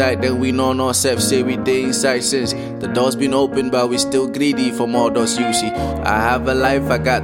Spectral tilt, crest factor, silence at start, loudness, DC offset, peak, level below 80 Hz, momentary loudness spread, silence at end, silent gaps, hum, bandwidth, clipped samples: -4 dB/octave; 16 dB; 0 s; -17 LUFS; under 0.1%; -2 dBFS; -38 dBFS; 3 LU; 0 s; none; none; 16.5 kHz; under 0.1%